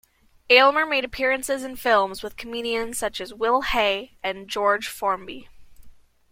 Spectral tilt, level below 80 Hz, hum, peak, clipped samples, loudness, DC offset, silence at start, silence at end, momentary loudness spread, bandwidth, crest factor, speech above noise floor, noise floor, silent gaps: -2 dB/octave; -50 dBFS; none; -2 dBFS; under 0.1%; -22 LUFS; under 0.1%; 0.5 s; 0.4 s; 14 LU; 16.5 kHz; 22 dB; 24 dB; -47 dBFS; none